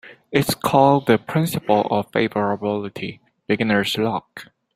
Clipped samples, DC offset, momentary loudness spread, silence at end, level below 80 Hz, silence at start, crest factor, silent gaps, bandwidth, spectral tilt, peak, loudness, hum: under 0.1%; under 0.1%; 14 LU; 0.3 s; -56 dBFS; 0.05 s; 20 dB; none; 16 kHz; -5.5 dB/octave; 0 dBFS; -20 LUFS; none